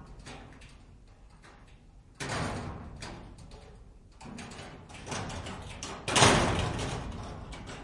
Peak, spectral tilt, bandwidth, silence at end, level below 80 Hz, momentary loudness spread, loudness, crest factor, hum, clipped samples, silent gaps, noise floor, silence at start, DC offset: -6 dBFS; -3.5 dB/octave; 11.5 kHz; 0 s; -48 dBFS; 27 LU; -30 LUFS; 28 dB; none; under 0.1%; none; -55 dBFS; 0 s; under 0.1%